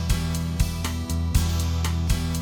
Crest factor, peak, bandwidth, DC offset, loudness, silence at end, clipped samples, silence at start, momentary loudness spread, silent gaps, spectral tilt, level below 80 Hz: 16 dB; -8 dBFS; over 20 kHz; 0.1%; -25 LUFS; 0 s; under 0.1%; 0 s; 4 LU; none; -5 dB/octave; -28 dBFS